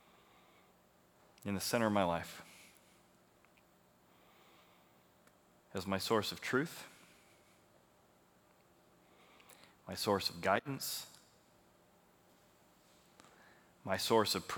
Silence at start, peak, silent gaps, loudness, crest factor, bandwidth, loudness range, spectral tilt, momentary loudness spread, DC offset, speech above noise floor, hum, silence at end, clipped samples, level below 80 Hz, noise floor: 1.4 s; -16 dBFS; none; -36 LUFS; 26 dB; over 20 kHz; 9 LU; -4 dB/octave; 25 LU; under 0.1%; 32 dB; none; 0 s; under 0.1%; -78 dBFS; -68 dBFS